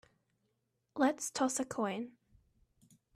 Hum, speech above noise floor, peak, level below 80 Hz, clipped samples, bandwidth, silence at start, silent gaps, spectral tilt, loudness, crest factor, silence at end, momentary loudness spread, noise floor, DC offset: none; 47 dB; -18 dBFS; -76 dBFS; under 0.1%; 14 kHz; 0.95 s; none; -3.5 dB/octave; -35 LUFS; 20 dB; 1.05 s; 14 LU; -82 dBFS; under 0.1%